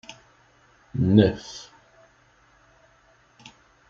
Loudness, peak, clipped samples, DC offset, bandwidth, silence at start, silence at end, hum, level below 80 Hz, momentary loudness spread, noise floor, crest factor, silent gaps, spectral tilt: -22 LUFS; -2 dBFS; under 0.1%; under 0.1%; 7.4 kHz; 0.95 s; 2.25 s; none; -56 dBFS; 26 LU; -59 dBFS; 24 dB; none; -7.5 dB/octave